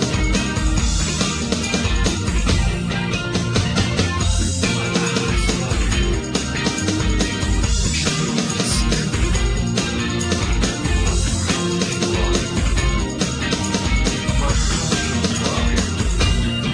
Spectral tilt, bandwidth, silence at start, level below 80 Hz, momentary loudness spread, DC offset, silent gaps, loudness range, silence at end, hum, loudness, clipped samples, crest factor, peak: -4 dB/octave; 10.5 kHz; 0 s; -24 dBFS; 2 LU; under 0.1%; none; 0 LU; 0 s; none; -20 LUFS; under 0.1%; 16 dB; -2 dBFS